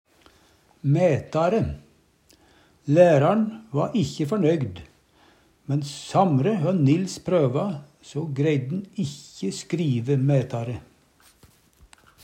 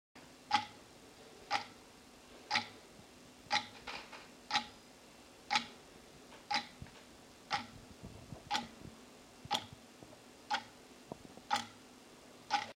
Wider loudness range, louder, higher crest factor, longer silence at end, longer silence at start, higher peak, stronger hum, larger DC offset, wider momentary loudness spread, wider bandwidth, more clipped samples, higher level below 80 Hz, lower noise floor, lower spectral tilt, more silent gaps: about the same, 4 LU vs 3 LU; first, -23 LUFS vs -39 LUFS; second, 20 dB vs 28 dB; first, 1.45 s vs 0.05 s; first, 0.85 s vs 0.15 s; first, -4 dBFS vs -16 dBFS; neither; neither; second, 13 LU vs 21 LU; second, 10.5 kHz vs 16 kHz; neither; first, -56 dBFS vs -70 dBFS; about the same, -59 dBFS vs -59 dBFS; first, -7.5 dB/octave vs -2 dB/octave; neither